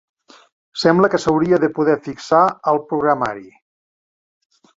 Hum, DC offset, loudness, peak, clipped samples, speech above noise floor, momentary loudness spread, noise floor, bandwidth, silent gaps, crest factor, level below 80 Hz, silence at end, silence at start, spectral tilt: none; under 0.1%; -17 LUFS; 0 dBFS; under 0.1%; over 74 dB; 8 LU; under -90 dBFS; 7.8 kHz; none; 18 dB; -56 dBFS; 1.3 s; 0.75 s; -6 dB/octave